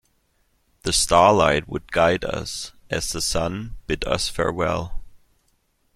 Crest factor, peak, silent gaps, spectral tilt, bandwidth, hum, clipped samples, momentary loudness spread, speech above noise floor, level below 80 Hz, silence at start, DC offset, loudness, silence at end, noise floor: 22 dB; -2 dBFS; none; -3.5 dB/octave; 15.5 kHz; none; under 0.1%; 15 LU; 45 dB; -40 dBFS; 0.85 s; under 0.1%; -21 LUFS; 0.8 s; -66 dBFS